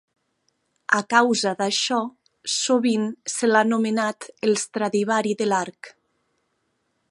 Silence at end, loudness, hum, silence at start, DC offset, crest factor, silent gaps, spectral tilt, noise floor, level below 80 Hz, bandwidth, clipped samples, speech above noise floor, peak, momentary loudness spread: 1.2 s; -22 LUFS; none; 0.9 s; under 0.1%; 20 dB; none; -3 dB/octave; -72 dBFS; -76 dBFS; 11.5 kHz; under 0.1%; 50 dB; -4 dBFS; 8 LU